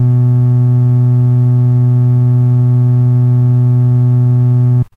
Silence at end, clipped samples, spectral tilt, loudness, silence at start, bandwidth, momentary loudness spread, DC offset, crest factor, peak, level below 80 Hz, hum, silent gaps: 0.1 s; under 0.1%; -12 dB/octave; -10 LUFS; 0 s; 1.8 kHz; 0 LU; under 0.1%; 6 dB; -4 dBFS; -42 dBFS; none; none